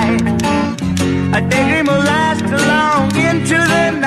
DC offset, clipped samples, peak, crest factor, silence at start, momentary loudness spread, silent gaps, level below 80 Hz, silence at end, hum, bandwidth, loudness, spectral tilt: under 0.1%; under 0.1%; -2 dBFS; 12 dB; 0 s; 4 LU; none; -38 dBFS; 0 s; none; 15 kHz; -14 LUFS; -5 dB/octave